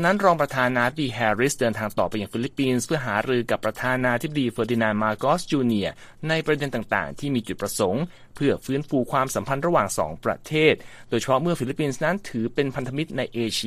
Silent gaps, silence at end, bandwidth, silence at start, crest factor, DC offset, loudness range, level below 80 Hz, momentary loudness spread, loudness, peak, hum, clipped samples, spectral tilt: none; 0 s; 15 kHz; 0 s; 20 dB; under 0.1%; 2 LU; -52 dBFS; 7 LU; -24 LUFS; -4 dBFS; none; under 0.1%; -5 dB/octave